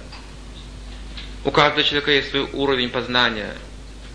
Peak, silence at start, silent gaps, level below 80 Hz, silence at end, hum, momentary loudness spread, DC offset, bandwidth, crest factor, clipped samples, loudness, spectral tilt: 0 dBFS; 0 s; none; -38 dBFS; 0 s; none; 22 LU; under 0.1%; 10.5 kHz; 22 dB; under 0.1%; -19 LUFS; -4.5 dB/octave